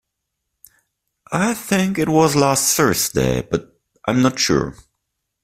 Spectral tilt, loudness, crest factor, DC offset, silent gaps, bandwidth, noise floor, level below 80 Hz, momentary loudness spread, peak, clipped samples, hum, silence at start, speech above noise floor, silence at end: -4 dB/octave; -18 LUFS; 18 dB; under 0.1%; none; 16 kHz; -78 dBFS; -44 dBFS; 10 LU; -2 dBFS; under 0.1%; none; 1.3 s; 60 dB; 0.7 s